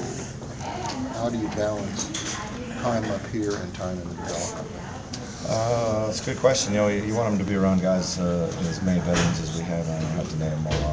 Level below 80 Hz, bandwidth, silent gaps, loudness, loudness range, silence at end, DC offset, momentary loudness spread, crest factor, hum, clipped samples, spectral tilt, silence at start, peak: -42 dBFS; 8 kHz; none; -26 LUFS; 6 LU; 0 s; under 0.1%; 11 LU; 20 dB; none; under 0.1%; -5 dB/octave; 0 s; -4 dBFS